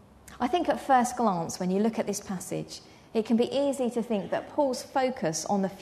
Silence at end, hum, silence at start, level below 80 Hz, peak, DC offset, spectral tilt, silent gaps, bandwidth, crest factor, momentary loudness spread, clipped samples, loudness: 0 s; none; 0.25 s; -62 dBFS; -12 dBFS; under 0.1%; -5 dB/octave; none; 13.5 kHz; 18 dB; 10 LU; under 0.1%; -28 LUFS